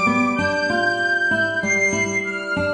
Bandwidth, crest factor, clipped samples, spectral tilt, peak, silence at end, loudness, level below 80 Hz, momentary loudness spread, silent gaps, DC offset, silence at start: 10 kHz; 12 dB; under 0.1%; -4 dB/octave; -8 dBFS; 0 s; -19 LUFS; -54 dBFS; 4 LU; none; under 0.1%; 0 s